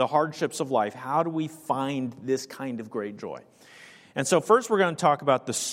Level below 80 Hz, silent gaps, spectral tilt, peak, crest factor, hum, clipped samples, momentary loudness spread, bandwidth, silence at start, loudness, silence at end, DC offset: -74 dBFS; none; -4.5 dB/octave; -6 dBFS; 20 dB; none; under 0.1%; 13 LU; 16 kHz; 0 s; -26 LUFS; 0 s; under 0.1%